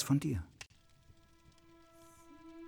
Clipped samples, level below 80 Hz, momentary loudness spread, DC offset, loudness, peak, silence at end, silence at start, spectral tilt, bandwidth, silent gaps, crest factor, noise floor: under 0.1%; -60 dBFS; 27 LU; under 0.1%; -37 LUFS; -20 dBFS; 0 s; 0 s; -6 dB/octave; 19 kHz; none; 20 dB; -64 dBFS